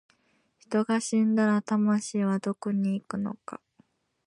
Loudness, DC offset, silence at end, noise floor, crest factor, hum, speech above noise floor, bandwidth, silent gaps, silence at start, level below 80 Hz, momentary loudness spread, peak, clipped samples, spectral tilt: -27 LUFS; under 0.1%; 0.7 s; -70 dBFS; 14 dB; none; 43 dB; 11 kHz; none; 0.7 s; -74 dBFS; 11 LU; -14 dBFS; under 0.1%; -6 dB/octave